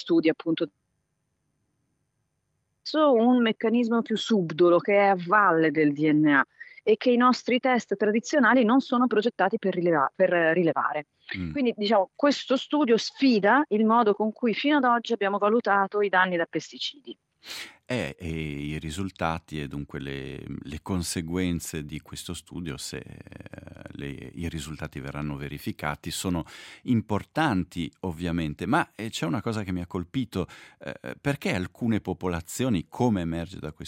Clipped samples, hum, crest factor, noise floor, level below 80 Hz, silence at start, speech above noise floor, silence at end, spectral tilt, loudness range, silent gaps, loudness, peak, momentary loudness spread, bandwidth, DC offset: under 0.1%; none; 20 dB; -77 dBFS; -56 dBFS; 0 s; 51 dB; 0 s; -5.5 dB/octave; 11 LU; none; -25 LUFS; -6 dBFS; 16 LU; 16 kHz; under 0.1%